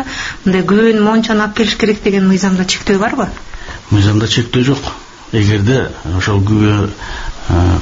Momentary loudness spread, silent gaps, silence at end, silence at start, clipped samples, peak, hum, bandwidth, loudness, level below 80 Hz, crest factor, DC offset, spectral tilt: 12 LU; none; 0 s; 0 s; under 0.1%; 0 dBFS; none; 8 kHz; -13 LUFS; -30 dBFS; 12 dB; under 0.1%; -5.5 dB/octave